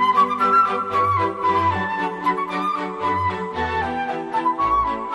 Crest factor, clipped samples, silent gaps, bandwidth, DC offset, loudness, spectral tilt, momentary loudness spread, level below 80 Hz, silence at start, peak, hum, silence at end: 14 dB; under 0.1%; none; 12 kHz; under 0.1%; -20 LUFS; -6 dB/octave; 7 LU; -46 dBFS; 0 s; -6 dBFS; none; 0 s